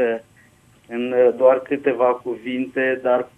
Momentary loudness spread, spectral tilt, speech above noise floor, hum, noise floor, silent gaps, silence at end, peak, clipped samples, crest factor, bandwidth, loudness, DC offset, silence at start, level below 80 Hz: 12 LU; -6.5 dB/octave; 34 dB; none; -53 dBFS; none; 0.1 s; -4 dBFS; under 0.1%; 16 dB; 3.7 kHz; -20 LUFS; under 0.1%; 0 s; -66 dBFS